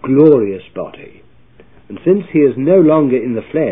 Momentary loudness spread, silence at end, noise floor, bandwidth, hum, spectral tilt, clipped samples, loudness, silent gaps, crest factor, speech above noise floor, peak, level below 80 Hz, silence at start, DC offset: 18 LU; 0 s; -47 dBFS; 3.9 kHz; none; -12.5 dB/octave; under 0.1%; -12 LUFS; none; 14 dB; 35 dB; 0 dBFS; -54 dBFS; 0 s; 0.6%